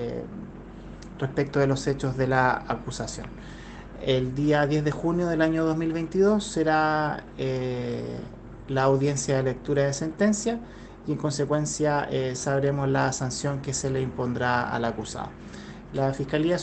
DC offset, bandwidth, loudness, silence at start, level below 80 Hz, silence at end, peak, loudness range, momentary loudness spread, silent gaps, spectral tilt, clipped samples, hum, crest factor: under 0.1%; 9 kHz; -26 LUFS; 0 s; -48 dBFS; 0 s; -6 dBFS; 3 LU; 17 LU; none; -5.5 dB/octave; under 0.1%; none; 20 dB